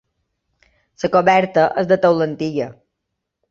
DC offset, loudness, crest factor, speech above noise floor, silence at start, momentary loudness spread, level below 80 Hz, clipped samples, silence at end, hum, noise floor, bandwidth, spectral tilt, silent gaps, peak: under 0.1%; -17 LUFS; 18 dB; 62 dB; 1 s; 12 LU; -60 dBFS; under 0.1%; 0.8 s; none; -78 dBFS; 7.4 kHz; -6.5 dB/octave; none; -2 dBFS